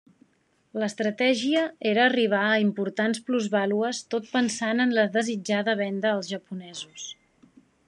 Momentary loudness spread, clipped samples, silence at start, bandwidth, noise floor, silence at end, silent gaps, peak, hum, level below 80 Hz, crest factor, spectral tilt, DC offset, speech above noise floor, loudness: 14 LU; under 0.1%; 0.75 s; 10.5 kHz; -67 dBFS; 0.75 s; none; -8 dBFS; none; -80 dBFS; 18 dB; -4 dB/octave; under 0.1%; 42 dB; -25 LUFS